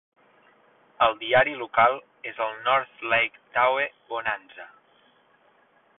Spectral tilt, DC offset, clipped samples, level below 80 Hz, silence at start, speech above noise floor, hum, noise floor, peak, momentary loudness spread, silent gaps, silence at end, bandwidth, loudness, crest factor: -7.5 dB/octave; under 0.1%; under 0.1%; -64 dBFS; 1 s; 37 dB; none; -62 dBFS; -6 dBFS; 13 LU; none; 1.35 s; 4.1 kHz; -24 LUFS; 20 dB